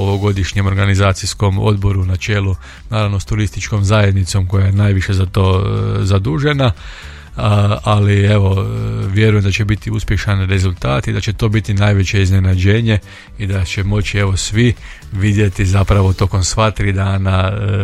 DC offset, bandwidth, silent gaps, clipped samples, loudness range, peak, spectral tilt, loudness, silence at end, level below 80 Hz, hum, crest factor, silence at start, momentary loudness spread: under 0.1%; 11.5 kHz; none; under 0.1%; 1 LU; 0 dBFS; -6 dB/octave; -15 LUFS; 0 s; -30 dBFS; none; 12 dB; 0 s; 6 LU